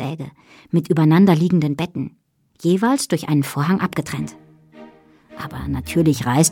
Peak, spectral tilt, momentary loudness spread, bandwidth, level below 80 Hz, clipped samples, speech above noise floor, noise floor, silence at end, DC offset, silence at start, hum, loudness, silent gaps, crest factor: -4 dBFS; -6 dB/octave; 18 LU; 17 kHz; -46 dBFS; under 0.1%; 28 dB; -47 dBFS; 0 s; under 0.1%; 0 s; none; -19 LUFS; none; 16 dB